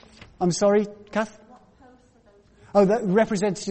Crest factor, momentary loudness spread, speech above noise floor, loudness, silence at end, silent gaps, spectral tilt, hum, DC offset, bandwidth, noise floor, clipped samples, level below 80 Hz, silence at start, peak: 18 dB; 9 LU; 35 dB; -23 LUFS; 0 s; none; -5.5 dB/octave; none; under 0.1%; 8.8 kHz; -56 dBFS; under 0.1%; -58 dBFS; 0.4 s; -6 dBFS